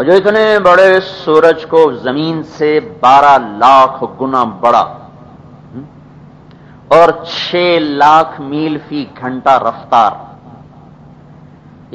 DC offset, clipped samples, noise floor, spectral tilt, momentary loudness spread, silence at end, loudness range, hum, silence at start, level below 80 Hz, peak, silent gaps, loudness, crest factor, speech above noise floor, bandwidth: under 0.1%; 1%; -37 dBFS; -5.5 dB/octave; 13 LU; 1.45 s; 6 LU; none; 0 s; -50 dBFS; 0 dBFS; none; -10 LUFS; 12 dB; 28 dB; 11 kHz